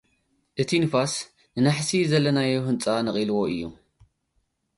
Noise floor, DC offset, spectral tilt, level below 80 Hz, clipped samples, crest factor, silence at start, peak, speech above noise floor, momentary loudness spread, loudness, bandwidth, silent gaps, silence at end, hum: -73 dBFS; under 0.1%; -5 dB/octave; -60 dBFS; under 0.1%; 16 dB; 0.55 s; -8 dBFS; 49 dB; 11 LU; -24 LUFS; 11.5 kHz; none; 1.05 s; none